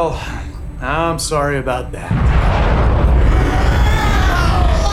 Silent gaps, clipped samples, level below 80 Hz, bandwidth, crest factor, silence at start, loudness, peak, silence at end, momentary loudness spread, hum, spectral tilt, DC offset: none; under 0.1%; -16 dBFS; 13.5 kHz; 12 dB; 0 s; -16 LUFS; -2 dBFS; 0 s; 10 LU; none; -5.5 dB/octave; under 0.1%